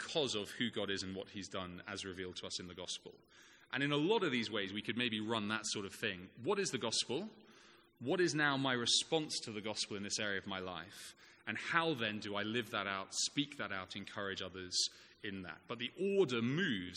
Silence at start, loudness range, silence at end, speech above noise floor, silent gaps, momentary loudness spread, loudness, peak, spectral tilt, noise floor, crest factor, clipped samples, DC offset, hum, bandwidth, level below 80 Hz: 0 s; 4 LU; 0 s; 25 dB; none; 12 LU; -38 LUFS; -16 dBFS; -3 dB/octave; -64 dBFS; 24 dB; under 0.1%; under 0.1%; none; 14 kHz; -78 dBFS